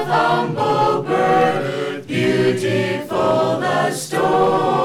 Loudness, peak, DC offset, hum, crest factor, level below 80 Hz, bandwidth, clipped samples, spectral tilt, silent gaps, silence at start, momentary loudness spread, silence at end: -18 LUFS; -2 dBFS; under 0.1%; none; 14 dB; -54 dBFS; 15 kHz; under 0.1%; -5.5 dB/octave; none; 0 s; 5 LU; 0 s